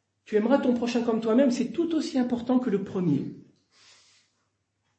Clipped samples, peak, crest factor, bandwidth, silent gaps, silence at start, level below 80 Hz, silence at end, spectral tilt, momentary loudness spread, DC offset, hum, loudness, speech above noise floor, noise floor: under 0.1%; -10 dBFS; 18 dB; 8.6 kHz; none; 0.3 s; -68 dBFS; 1.6 s; -6.5 dB/octave; 6 LU; under 0.1%; none; -26 LUFS; 51 dB; -75 dBFS